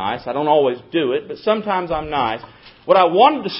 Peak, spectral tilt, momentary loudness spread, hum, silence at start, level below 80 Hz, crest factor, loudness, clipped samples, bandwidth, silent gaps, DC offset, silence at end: 0 dBFS; -8.5 dB/octave; 9 LU; none; 0 s; -50 dBFS; 18 dB; -18 LUFS; under 0.1%; 5.8 kHz; none; under 0.1%; 0 s